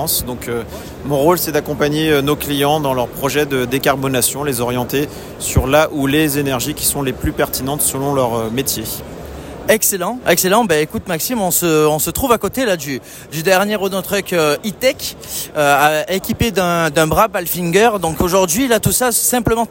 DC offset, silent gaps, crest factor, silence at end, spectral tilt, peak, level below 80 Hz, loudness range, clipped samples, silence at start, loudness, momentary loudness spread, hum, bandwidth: under 0.1%; none; 16 dB; 0 s; -4 dB/octave; 0 dBFS; -36 dBFS; 3 LU; under 0.1%; 0 s; -16 LUFS; 9 LU; none; 17 kHz